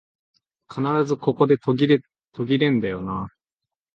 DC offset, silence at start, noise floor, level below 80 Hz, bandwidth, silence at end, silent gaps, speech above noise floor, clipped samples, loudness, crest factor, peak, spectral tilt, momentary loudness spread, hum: under 0.1%; 0.7 s; -87 dBFS; -56 dBFS; 7.4 kHz; 0.65 s; none; 67 dB; under 0.1%; -22 LUFS; 18 dB; -6 dBFS; -7.5 dB/octave; 12 LU; none